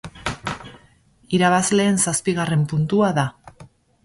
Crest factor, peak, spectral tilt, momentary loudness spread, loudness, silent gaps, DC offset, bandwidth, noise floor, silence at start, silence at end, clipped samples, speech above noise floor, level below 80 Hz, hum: 16 dB; -4 dBFS; -4.5 dB/octave; 13 LU; -20 LUFS; none; under 0.1%; 11.5 kHz; -55 dBFS; 0.05 s; 0.4 s; under 0.1%; 36 dB; -50 dBFS; none